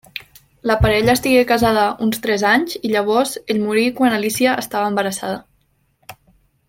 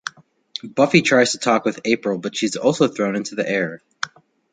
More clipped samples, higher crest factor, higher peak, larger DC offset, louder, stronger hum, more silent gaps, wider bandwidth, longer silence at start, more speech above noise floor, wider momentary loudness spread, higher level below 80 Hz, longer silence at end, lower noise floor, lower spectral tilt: neither; about the same, 16 dB vs 20 dB; about the same, -2 dBFS vs -2 dBFS; neither; about the same, -17 LUFS vs -19 LUFS; neither; neither; first, 17 kHz vs 9.6 kHz; about the same, 0.15 s vs 0.05 s; first, 45 dB vs 19 dB; second, 10 LU vs 15 LU; first, -38 dBFS vs -62 dBFS; about the same, 0.55 s vs 0.45 s; first, -62 dBFS vs -38 dBFS; about the same, -4.5 dB/octave vs -4.5 dB/octave